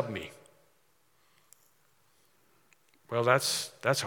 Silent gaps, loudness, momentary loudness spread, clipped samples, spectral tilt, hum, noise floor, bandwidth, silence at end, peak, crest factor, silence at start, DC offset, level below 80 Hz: none; -29 LUFS; 14 LU; under 0.1%; -3 dB/octave; none; -71 dBFS; 18 kHz; 0 s; -8 dBFS; 26 dB; 0 s; under 0.1%; -78 dBFS